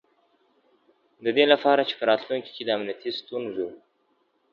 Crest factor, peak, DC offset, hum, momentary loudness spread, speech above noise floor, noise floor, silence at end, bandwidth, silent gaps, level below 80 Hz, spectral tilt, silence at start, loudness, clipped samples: 24 dB; -2 dBFS; under 0.1%; none; 13 LU; 45 dB; -69 dBFS; 0.75 s; 6.6 kHz; none; -78 dBFS; -6 dB/octave; 1.2 s; -25 LUFS; under 0.1%